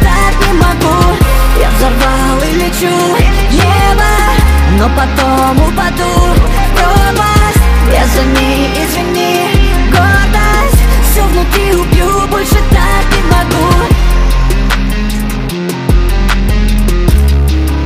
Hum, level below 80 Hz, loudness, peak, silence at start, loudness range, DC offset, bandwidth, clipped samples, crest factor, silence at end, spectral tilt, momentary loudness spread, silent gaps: none; -10 dBFS; -10 LUFS; 0 dBFS; 0 s; 2 LU; under 0.1%; 16 kHz; 0.1%; 8 dB; 0 s; -5 dB/octave; 3 LU; none